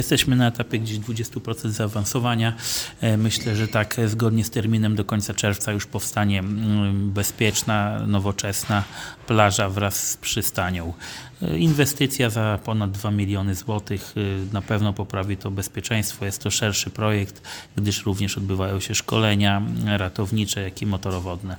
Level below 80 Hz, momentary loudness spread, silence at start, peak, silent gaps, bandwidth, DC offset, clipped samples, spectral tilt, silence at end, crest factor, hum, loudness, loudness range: -48 dBFS; 8 LU; 0 s; 0 dBFS; none; 19.5 kHz; under 0.1%; under 0.1%; -4.5 dB/octave; 0 s; 22 dB; none; -23 LUFS; 3 LU